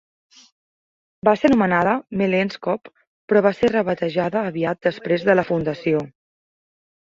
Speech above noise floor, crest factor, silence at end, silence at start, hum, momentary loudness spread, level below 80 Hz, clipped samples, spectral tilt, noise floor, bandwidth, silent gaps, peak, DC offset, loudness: over 71 dB; 20 dB; 1.1 s; 1.25 s; none; 7 LU; -56 dBFS; under 0.1%; -7.5 dB/octave; under -90 dBFS; 7.6 kHz; 3.07-3.28 s; -2 dBFS; under 0.1%; -20 LUFS